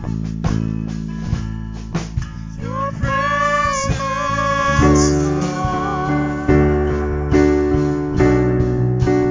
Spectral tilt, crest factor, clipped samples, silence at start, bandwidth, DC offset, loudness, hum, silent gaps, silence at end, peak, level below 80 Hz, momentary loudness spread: -6.5 dB/octave; 16 dB; under 0.1%; 0 s; 7.6 kHz; under 0.1%; -18 LUFS; none; none; 0 s; -2 dBFS; -26 dBFS; 11 LU